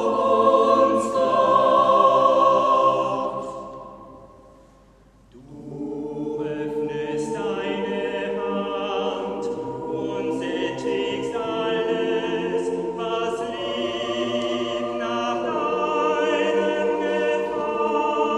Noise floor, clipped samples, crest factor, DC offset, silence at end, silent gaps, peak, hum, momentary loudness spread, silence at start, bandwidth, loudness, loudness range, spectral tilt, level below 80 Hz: -53 dBFS; under 0.1%; 18 dB; under 0.1%; 0 s; none; -4 dBFS; none; 12 LU; 0 s; 11 kHz; -22 LUFS; 12 LU; -5 dB/octave; -58 dBFS